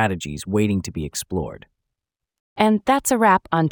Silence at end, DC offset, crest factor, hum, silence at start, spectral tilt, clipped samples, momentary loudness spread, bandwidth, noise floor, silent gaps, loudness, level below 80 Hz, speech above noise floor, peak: 0 s; under 0.1%; 18 dB; none; 0 s; -5 dB/octave; under 0.1%; 11 LU; over 20 kHz; -84 dBFS; 2.40-2.56 s; -20 LUFS; -48 dBFS; 64 dB; -2 dBFS